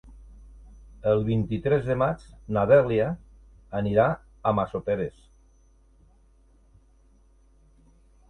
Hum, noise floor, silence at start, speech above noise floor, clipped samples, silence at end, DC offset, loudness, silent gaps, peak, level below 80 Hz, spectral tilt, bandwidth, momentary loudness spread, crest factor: none; -58 dBFS; 0.05 s; 35 dB; under 0.1%; 3.2 s; under 0.1%; -25 LUFS; none; -6 dBFS; -50 dBFS; -9 dB/octave; 9.2 kHz; 11 LU; 22 dB